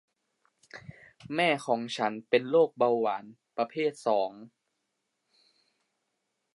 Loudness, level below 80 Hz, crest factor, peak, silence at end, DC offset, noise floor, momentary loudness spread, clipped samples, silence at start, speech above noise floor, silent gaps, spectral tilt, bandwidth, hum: -29 LUFS; -78 dBFS; 20 dB; -10 dBFS; 2.1 s; under 0.1%; -81 dBFS; 19 LU; under 0.1%; 0.75 s; 53 dB; none; -5 dB/octave; 11.5 kHz; none